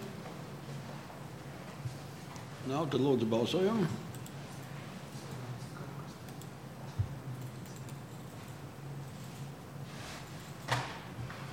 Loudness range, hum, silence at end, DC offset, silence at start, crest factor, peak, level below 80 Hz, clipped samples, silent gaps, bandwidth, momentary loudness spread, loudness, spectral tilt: 10 LU; none; 0 s; under 0.1%; 0 s; 20 dB; -18 dBFS; -62 dBFS; under 0.1%; none; 16.5 kHz; 16 LU; -39 LUFS; -6 dB/octave